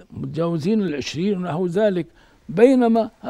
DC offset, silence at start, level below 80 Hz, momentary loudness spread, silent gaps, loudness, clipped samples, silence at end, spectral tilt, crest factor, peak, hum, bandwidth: under 0.1%; 0.1 s; -56 dBFS; 13 LU; none; -20 LUFS; under 0.1%; 0 s; -7 dB/octave; 18 dB; -2 dBFS; none; 11.5 kHz